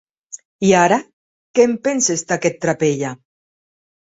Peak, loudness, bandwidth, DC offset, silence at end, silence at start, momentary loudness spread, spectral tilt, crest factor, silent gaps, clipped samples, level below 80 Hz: -2 dBFS; -17 LUFS; 8 kHz; under 0.1%; 1 s; 0.35 s; 15 LU; -4 dB/octave; 18 dB; 0.45-0.59 s, 1.13-1.54 s; under 0.1%; -58 dBFS